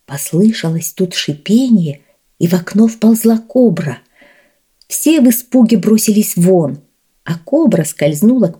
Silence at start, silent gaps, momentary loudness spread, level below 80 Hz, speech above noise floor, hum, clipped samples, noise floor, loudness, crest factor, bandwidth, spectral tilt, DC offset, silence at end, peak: 0.1 s; none; 11 LU; -60 dBFS; 42 dB; none; under 0.1%; -53 dBFS; -12 LUFS; 12 dB; 19.5 kHz; -5.5 dB/octave; under 0.1%; 0.05 s; 0 dBFS